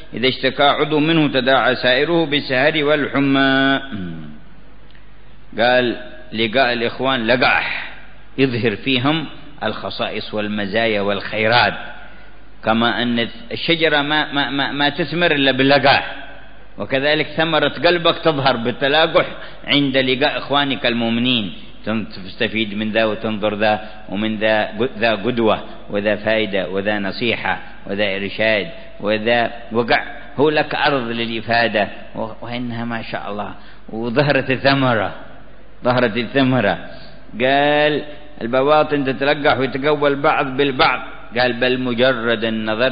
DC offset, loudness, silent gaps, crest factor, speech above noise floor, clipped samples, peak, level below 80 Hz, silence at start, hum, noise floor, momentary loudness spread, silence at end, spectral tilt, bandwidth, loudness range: 2%; -17 LUFS; none; 18 dB; 27 dB; under 0.1%; -2 dBFS; -46 dBFS; 0 s; none; -45 dBFS; 12 LU; 0 s; -10.5 dB/octave; 5.2 kHz; 4 LU